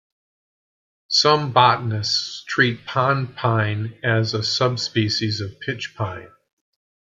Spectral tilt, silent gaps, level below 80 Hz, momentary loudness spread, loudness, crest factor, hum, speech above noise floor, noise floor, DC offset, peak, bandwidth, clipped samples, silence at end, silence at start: -4.5 dB/octave; none; -60 dBFS; 12 LU; -20 LUFS; 20 dB; none; over 69 dB; under -90 dBFS; under 0.1%; -2 dBFS; 7.8 kHz; under 0.1%; 0.9 s; 1.1 s